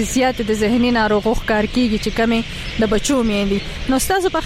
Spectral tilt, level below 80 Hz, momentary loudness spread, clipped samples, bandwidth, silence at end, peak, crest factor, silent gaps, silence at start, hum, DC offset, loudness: -4.5 dB/octave; -30 dBFS; 5 LU; under 0.1%; 16 kHz; 0 s; -8 dBFS; 10 dB; none; 0 s; none; under 0.1%; -18 LUFS